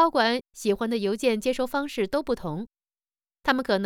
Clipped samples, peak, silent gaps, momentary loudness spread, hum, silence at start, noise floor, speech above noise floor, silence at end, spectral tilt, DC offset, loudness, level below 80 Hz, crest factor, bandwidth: under 0.1%; -8 dBFS; none; 6 LU; none; 0 s; under -90 dBFS; over 65 dB; 0 s; -4.5 dB/octave; under 0.1%; -26 LUFS; -56 dBFS; 18 dB; 19 kHz